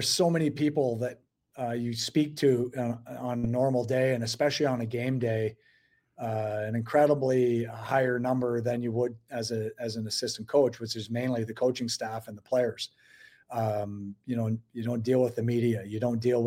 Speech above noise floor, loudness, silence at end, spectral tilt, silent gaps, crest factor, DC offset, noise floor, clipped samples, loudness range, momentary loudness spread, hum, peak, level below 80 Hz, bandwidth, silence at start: 39 dB; -29 LUFS; 0 s; -5.5 dB/octave; none; 18 dB; under 0.1%; -67 dBFS; under 0.1%; 4 LU; 9 LU; none; -12 dBFS; -66 dBFS; 16.5 kHz; 0 s